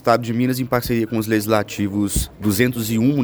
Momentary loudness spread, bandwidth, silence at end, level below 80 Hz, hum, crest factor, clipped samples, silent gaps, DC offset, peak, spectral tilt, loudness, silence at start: 3 LU; over 20 kHz; 0 s; -36 dBFS; none; 18 dB; under 0.1%; none; under 0.1%; -2 dBFS; -5.5 dB/octave; -20 LUFS; 0.05 s